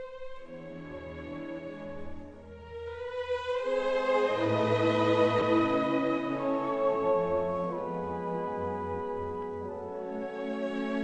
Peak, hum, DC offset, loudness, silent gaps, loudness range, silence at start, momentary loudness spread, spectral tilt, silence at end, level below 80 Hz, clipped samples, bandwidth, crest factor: -14 dBFS; none; under 0.1%; -30 LUFS; none; 9 LU; 0 s; 17 LU; -7 dB/octave; 0 s; -58 dBFS; under 0.1%; 8.8 kHz; 18 dB